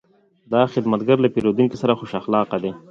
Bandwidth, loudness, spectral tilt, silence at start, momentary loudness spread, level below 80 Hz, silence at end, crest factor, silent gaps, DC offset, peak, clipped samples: 7.6 kHz; -20 LUFS; -8 dB/octave; 0.5 s; 6 LU; -58 dBFS; 0.1 s; 18 dB; none; under 0.1%; -2 dBFS; under 0.1%